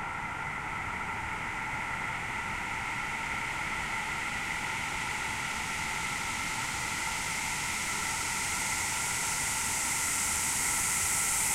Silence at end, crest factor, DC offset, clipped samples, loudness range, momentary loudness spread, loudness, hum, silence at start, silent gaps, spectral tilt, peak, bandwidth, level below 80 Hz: 0 s; 16 dB; under 0.1%; under 0.1%; 5 LU; 7 LU; -31 LUFS; none; 0 s; none; -1 dB/octave; -16 dBFS; 16 kHz; -52 dBFS